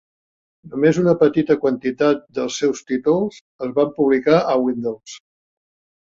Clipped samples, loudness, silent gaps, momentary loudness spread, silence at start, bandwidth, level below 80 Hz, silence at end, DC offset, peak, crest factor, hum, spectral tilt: under 0.1%; -19 LUFS; 3.41-3.59 s; 12 LU; 0.65 s; 7.8 kHz; -60 dBFS; 0.85 s; under 0.1%; -2 dBFS; 18 dB; none; -6 dB/octave